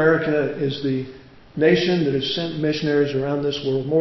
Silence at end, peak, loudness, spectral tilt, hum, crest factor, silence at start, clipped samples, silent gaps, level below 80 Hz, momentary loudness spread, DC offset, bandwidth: 0 s; -4 dBFS; -21 LUFS; -6.5 dB/octave; none; 16 dB; 0 s; under 0.1%; none; -54 dBFS; 7 LU; under 0.1%; 6 kHz